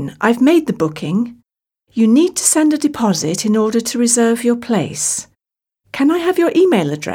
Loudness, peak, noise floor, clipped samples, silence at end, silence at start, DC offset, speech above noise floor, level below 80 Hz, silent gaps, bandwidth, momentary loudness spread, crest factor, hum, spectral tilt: -15 LUFS; -2 dBFS; -85 dBFS; under 0.1%; 0 s; 0 s; under 0.1%; 71 dB; -58 dBFS; none; 16.5 kHz; 7 LU; 14 dB; none; -4 dB/octave